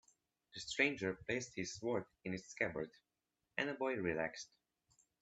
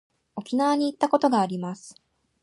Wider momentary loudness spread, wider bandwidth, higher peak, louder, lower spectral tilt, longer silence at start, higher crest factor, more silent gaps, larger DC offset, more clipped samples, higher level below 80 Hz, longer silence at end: second, 14 LU vs 18 LU; second, 8.4 kHz vs 11.5 kHz; second, -18 dBFS vs -6 dBFS; second, -41 LUFS vs -24 LUFS; second, -4 dB/octave vs -6 dB/octave; first, 0.55 s vs 0.35 s; about the same, 24 dB vs 20 dB; neither; neither; neither; about the same, -74 dBFS vs -76 dBFS; first, 0.75 s vs 0.5 s